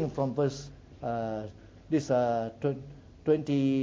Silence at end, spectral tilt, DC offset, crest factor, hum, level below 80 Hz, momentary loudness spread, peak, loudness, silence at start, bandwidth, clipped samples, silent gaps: 0 s; -7.5 dB/octave; under 0.1%; 16 dB; none; -58 dBFS; 16 LU; -14 dBFS; -31 LUFS; 0 s; 7.8 kHz; under 0.1%; none